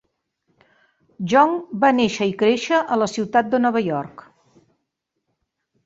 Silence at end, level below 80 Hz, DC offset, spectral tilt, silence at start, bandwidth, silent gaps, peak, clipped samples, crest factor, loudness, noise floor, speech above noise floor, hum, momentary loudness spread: 1.75 s; -62 dBFS; under 0.1%; -5 dB/octave; 1.2 s; 8 kHz; none; -2 dBFS; under 0.1%; 20 dB; -19 LUFS; -77 dBFS; 59 dB; none; 9 LU